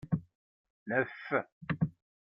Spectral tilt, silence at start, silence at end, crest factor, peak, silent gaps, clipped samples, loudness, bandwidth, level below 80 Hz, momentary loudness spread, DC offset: -10 dB/octave; 0.05 s; 0.3 s; 20 dB; -16 dBFS; 0.35-0.86 s, 1.52-1.61 s; under 0.1%; -35 LUFS; 5.6 kHz; -64 dBFS; 5 LU; under 0.1%